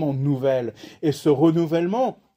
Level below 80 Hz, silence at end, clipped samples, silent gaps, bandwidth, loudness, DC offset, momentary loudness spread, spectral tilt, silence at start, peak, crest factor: -62 dBFS; 0.2 s; under 0.1%; none; 16 kHz; -22 LUFS; under 0.1%; 8 LU; -8 dB/octave; 0 s; -6 dBFS; 16 dB